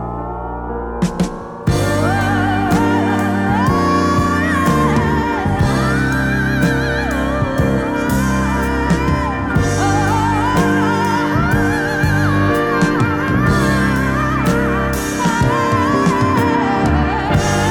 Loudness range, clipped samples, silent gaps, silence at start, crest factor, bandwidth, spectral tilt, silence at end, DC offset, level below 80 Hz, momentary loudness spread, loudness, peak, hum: 1 LU; under 0.1%; none; 0 s; 14 dB; 19 kHz; -6 dB/octave; 0 s; under 0.1%; -28 dBFS; 4 LU; -16 LUFS; -2 dBFS; none